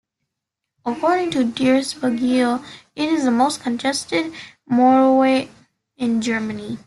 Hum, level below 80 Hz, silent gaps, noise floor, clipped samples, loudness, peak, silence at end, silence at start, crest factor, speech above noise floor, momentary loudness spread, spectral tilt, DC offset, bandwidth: none; -62 dBFS; none; -81 dBFS; under 0.1%; -19 LUFS; -6 dBFS; 0.1 s; 0.85 s; 14 dB; 63 dB; 13 LU; -4.5 dB/octave; under 0.1%; 12 kHz